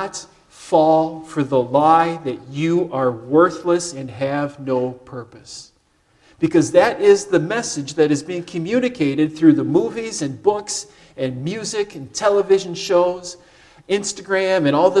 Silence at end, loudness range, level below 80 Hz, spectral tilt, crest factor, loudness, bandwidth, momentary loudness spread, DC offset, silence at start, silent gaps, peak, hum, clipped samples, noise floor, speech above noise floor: 0 s; 4 LU; -58 dBFS; -5 dB/octave; 18 dB; -19 LUFS; 12 kHz; 13 LU; under 0.1%; 0 s; none; -2 dBFS; none; under 0.1%; -60 dBFS; 42 dB